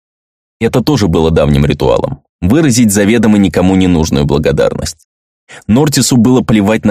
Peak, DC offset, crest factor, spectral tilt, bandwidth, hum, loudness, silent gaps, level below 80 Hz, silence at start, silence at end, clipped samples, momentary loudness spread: 0 dBFS; under 0.1%; 10 dB; -5.5 dB/octave; 16 kHz; none; -10 LUFS; 2.29-2.39 s, 5.05-5.47 s; -28 dBFS; 0.6 s; 0 s; under 0.1%; 7 LU